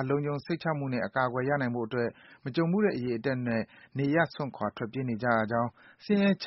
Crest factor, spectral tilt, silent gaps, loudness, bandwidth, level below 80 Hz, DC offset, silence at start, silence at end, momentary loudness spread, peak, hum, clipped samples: 18 dB; -6 dB/octave; none; -30 LUFS; 5.8 kHz; -66 dBFS; under 0.1%; 0 s; 0 s; 8 LU; -12 dBFS; none; under 0.1%